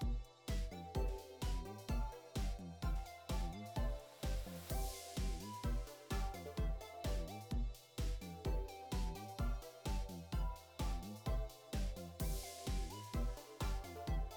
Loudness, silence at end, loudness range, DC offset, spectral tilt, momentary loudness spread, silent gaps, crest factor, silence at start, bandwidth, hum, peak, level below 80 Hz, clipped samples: -45 LUFS; 0 s; 1 LU; under 0.1%; -5.5 dB/octave; 3 LU; none; 14 dB; 0 s; over 20 kHz; none; -30 dBFS; -44 dBFS; under 0.1%